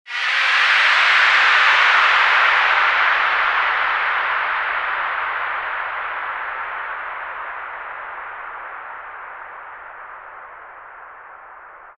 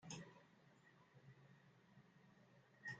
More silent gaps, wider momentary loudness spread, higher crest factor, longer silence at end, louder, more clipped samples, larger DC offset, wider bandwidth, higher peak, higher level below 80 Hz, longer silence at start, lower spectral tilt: neither; first, 23 LU vs 13 LU; second, 16 dB vs 22 dB; about the same, 0.1 s vs 0 s; first, -16 LUFS vs -62 LUFS; neither; neither; first, 11 kHz vs 8.8 kHz; first, -4 dBFS vs -40 dBFS; first, -58 dBFS vs under -90 dBFS; about the same, 0.05 s vs 0 s; second, 1 dB/octave vs -3.5 dB/octave